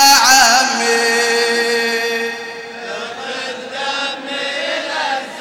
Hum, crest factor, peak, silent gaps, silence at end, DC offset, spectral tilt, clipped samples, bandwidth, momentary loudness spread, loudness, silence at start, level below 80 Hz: none; 14 dB; -2 dBFS; none; 0 s; under 0.1%; 0.5 dB/octave; under 0.1%; 17 kHz; 17 LU; -14 LUFS; 0 s; -56 dBFS